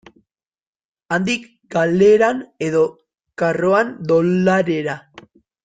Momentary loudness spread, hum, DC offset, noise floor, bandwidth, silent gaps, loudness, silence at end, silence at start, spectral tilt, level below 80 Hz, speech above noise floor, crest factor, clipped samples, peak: 11 LU; none; under 0.1%; -76 dBFS; 9.2 kHz; none; -18 LUFS; 0.45 s; 1.1 s; -6.5 dB/octave; -58 dBFS; 59 dB; 16 dB; under 0.1%; -2 dBFS